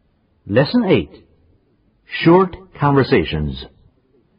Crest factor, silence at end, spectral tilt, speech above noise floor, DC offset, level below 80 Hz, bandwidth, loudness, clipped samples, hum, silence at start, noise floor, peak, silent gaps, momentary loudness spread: 16 dB; 0.7 s; -10.5 dB/octave; 43 dB; under 0.1%; -40 dBFS; 5.4 kHz; -16 LUFS; under 0.1%; none; 0.45 s; -59 dBFS; -2 dBFS; none; 14 LU